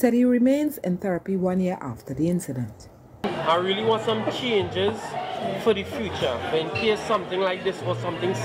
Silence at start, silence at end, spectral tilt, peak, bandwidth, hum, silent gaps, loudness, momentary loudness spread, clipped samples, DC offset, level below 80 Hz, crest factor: 0 s; 0 s; -6 dB/octave; -8 dBFS; 16 kHz; none; none; -25 LUFS; 9 LU; under 0.1%; under 0.1%; -58 dBFS; 18 dB